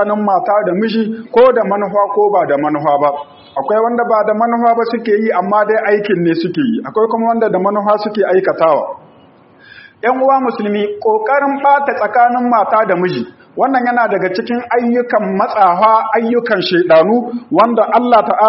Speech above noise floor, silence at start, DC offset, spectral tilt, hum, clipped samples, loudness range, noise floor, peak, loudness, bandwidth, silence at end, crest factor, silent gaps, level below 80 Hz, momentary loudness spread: 32 dB; 0 s; under 0.1%; -4 dB/octave; none; under 0.1%; 3 LU; -44 dBFS; 0 dBFS; -13 LUFS; 5.8 kHz; 0 s; 12 dB; none; -60 dBFS; 7 LU